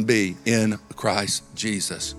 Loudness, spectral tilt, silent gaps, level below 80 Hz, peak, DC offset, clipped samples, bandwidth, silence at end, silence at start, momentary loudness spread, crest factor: -24 LUFS; -3.5 dB/octave; none; -54 dBFS; -4 dBFS; under 0.1%; under 0.1%; 15 kHz; 0 s; 0 s; 5 LU; 20 dB